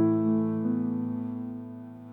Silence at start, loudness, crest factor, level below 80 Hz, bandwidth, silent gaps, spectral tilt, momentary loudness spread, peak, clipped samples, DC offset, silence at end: 0 s; -29 LUFS; 14 dB; -70 dBFS; 2.6 kHz; none; -12 dB/octave; 15 LU; -14 dBFS; under 0.1%; under 0.1%; 0 s